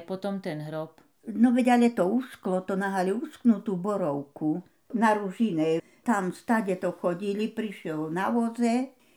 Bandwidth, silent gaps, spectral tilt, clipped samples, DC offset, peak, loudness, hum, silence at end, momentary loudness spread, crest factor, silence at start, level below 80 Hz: 13 kHz; none; -6.5 dB/octave; under 0.1%; under 0.1%; -10 dBFS; -27 LUFS; none; 0.25 s; 11 LU; 18 dB; 0 s; -78 dBFS